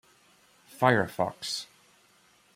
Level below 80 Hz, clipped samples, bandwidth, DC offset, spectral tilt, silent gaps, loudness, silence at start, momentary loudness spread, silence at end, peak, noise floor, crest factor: -68 dBFS; under 0.1%; 16 kHz; under 0.1%; -4.5 dB/octave; none; -28 LUFS; 0.75 s; 11 LU; 0.9 s; -8 dBFS; -63 dBFS; 24 dB